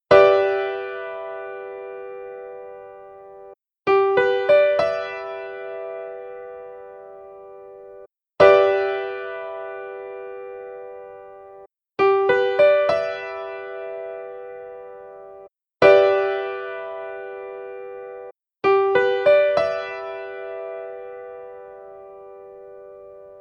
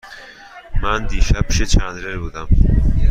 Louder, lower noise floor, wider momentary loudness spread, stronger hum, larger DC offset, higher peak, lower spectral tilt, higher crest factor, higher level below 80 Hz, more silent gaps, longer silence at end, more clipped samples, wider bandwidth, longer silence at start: about the same, -20 LUFS vs -19 LUFS; first, -47 dBFS vs -39 dBFS; first, 25 LU vs 20 LU; neither; neither; about the same, 0 dBFS vs -2 dBFS; about the same, -6 dB/octave vs -5 dB/octave; first, 22 dB vs 14 dB; second, -60 dBFS vs -18 dBFS; neither; about the same, 0 s vs 0 s; neither; second, 6.6 kHz vs 9.2 kHz; about the same, 0.1 s vs 0.05 s